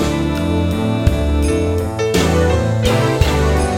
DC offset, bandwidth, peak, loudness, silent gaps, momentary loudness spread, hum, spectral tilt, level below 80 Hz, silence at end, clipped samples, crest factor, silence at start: under 0.1%; 16.5 kHz; 0 dBFS; -16 LUFS; none; 3 LU; none; -6 dB/octave; -22 dBFS; 0 s; under 0.1%; 14 dB; 0 s